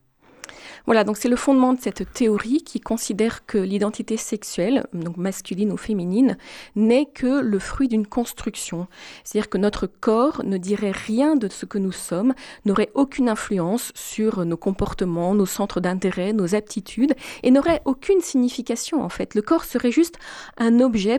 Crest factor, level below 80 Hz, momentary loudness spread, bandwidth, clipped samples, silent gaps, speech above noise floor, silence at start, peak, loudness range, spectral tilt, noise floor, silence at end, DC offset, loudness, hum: 16 dB; -46 dBFS; 9 LU; 18.5 kHz; under 0.1%; none; 23 dB; 0.5 s; -6 dBFS; 3 LU; -5.5 dB/octave; -45 dBFS; 0 s; under 0.1%; -22 LUFS; none